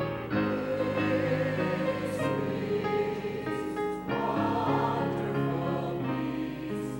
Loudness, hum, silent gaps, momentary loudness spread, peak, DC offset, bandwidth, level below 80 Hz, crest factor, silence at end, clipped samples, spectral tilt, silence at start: -30 LUFS; none; none; 5 LU; -16 dBFS; under 0.1%; 16 kHz; -56 dBFS; 14 dB; 0 s; under 0.1%; -7.5 dB/octave; 0 s